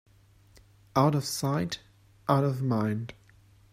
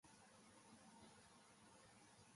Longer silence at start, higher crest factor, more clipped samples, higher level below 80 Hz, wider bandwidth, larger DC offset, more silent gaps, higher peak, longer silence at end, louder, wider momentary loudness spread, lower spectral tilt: first, 0.95 s vs 0.05 s; first, 20 dB vs 14 dB; neither; first, -62 dBFS vs -88 dBFS; first, 15.5 kHz vs 11.5 kHz; neither; neither; first, -10 dBFS vs -54 dBFS; first, 0.6 s vs 0 s; first, -29 LUFS vs -67 LUFS; first, 12 LU vs 2 LU; first, -6 dB/octave vs -3 dB/octave